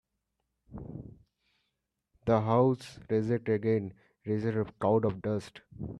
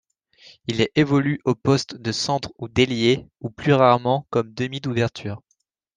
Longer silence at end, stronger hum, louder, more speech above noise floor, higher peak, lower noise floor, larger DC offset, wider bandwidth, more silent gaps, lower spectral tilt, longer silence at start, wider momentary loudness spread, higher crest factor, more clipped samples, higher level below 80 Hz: second, 0 s vs 0.6 s; neither; second, -30 LUFS vs -21 LUFS; first, 54 dB vs 50 dB; second, -12 dBFS vs -2 dBFS; first, -83 dBFS vs -71 dBFS; neither; first, 11.5 kHz vs 9.8 kHz; neither; first, -8.5 dB/octave vs -5.5 dB/octave; about the same, 0.7 s vs 0.7 s; first, 19 LU vs 11 LU; about the same, 20 dB vs 20 dB; neither; second, -60 dBFS vs -54 dBFS